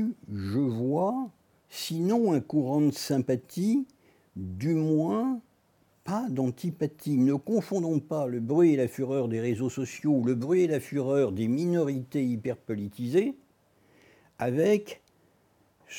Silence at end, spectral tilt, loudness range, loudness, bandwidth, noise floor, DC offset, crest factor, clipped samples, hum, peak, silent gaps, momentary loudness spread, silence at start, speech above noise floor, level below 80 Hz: 0 s; -7 dB/octave; 4 LU; -28 LUFS; 19 kHz; -66 dBFS; under 0.1%; 16 dB; under 0.1%; none; -12 dBFS; none; 10 LU; 0 s; 39 dB; -74 dBFS